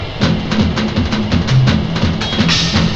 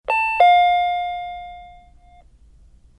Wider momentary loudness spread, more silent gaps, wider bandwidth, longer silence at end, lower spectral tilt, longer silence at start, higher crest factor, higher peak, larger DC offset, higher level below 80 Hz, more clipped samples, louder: second, 4 LU vs 21 LU; neither; second, 8.2 kHz vs 10.5 kHz; second, 0 s vs 1.3 s; first, -5.5 dB/octave vs -2 dB/octave; about the same, 0 s vs 0.1 s; about the same, 14 dB vs 18 dB; about the same, 0 dBFS vs -2 dBFS; neither; first, -28 dBFS vs -50 dBFS; neither; first, -14 LUFS vs -17 LUFS